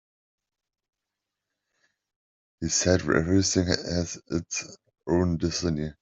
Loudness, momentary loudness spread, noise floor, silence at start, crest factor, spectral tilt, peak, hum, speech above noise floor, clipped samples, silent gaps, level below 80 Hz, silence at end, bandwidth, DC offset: -26 LUFS; 10 LU; -86 dBFS; 2.6 s; 24 dB; -4.5 dB/octave; -4 dBFS; none; 61 dB; under 0.1%; none; -52 dBFS; 0.1 s; 8.2 kHz; under 0.1%